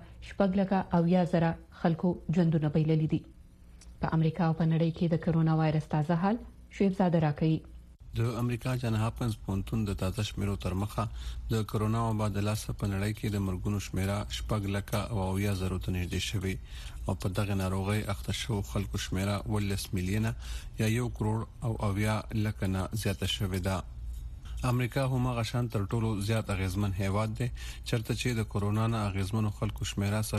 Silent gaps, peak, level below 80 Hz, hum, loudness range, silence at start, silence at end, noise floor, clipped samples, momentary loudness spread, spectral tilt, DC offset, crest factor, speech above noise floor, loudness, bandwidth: none; -14 dBFS; -44 dBFS; none; 4 LU; 0 s; 0 s; -52 dBFS; under 0.1%; 7 LU; -6.5 dB/octave; under 0.1%; 16 dB; 22 dB; -31 LUFS; 14.5 kHz